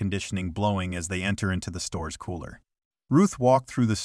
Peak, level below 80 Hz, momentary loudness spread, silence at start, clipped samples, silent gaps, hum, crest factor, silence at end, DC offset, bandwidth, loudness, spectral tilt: -8 dBFS; -48 dBFS; 13 LU; 0 s; under 0.1%; 2.85-2.91 s; none; 18 dB; 0 s; under 0.1%; 13 kHz; -26 LUFS; -5.5 dB/octave